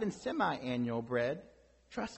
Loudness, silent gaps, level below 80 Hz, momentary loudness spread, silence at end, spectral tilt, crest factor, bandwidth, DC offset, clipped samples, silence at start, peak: -36 LUFS; none; -66 dBFS; 10 LU; 0 s; -6 dB/octave; 18 dB; 8.2 kHz; under 0.1%; under 0.1%; 0 s; -20 dBFS